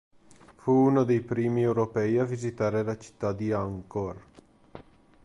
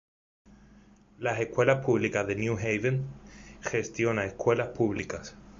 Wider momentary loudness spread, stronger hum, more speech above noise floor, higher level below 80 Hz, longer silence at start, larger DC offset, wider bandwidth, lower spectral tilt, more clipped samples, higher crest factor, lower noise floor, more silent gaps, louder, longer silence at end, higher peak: about the same, 12 LU vs 13 LU; neither; about the same, 28 dB vs 28 dB; about the same, -58 dBFS vs -56 dBFS; second, 0.65 s vs 1.2 s; neither; first, 11.5 kHz vs 7.6 kHz; first, -8.5 dB/octave vs -6 dB/octave; neither; about the same, 16 dB vs 20 dB; about the same, -54 dBFS vs -57 dBFS; neither; about the same, -27 LUFS vs -29 LUFS; first, 0.45 s vs 0 s; second, -12 dBFS vs -8 dBFS